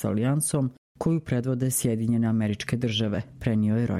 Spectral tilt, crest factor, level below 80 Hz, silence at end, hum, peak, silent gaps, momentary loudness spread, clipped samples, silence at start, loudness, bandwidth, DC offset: -5.5 dB/octave; 16 dB; -52 dBFS; 0 s; none; -10 dBFS; 0.78-0.95 s; 5 LU; under 0.1%; 0 s; -26 LUFS; 15.5 kHz; under 0.1%